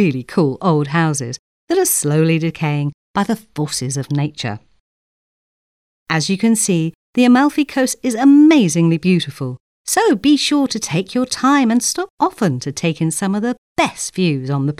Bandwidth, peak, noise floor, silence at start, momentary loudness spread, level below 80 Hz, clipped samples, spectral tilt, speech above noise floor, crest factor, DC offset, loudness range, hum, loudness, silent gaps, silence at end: 15.5 kHz; -2 dBFS; under -90 dBFS; 0 s; 10 LU; -56 dBFS; under 0.1%; -5 dB/octave; over 74 dB; 14 dB; 0.1%; 8 LU; none; -16 LUFS; 1.39-1.68 s, 2.94-3.14 s, 4.80-6.06 s, 6.95-7.13 s, 9.60-9.85 s, 12.10-12.18 s, 13.58-13.76 s; 0.05 s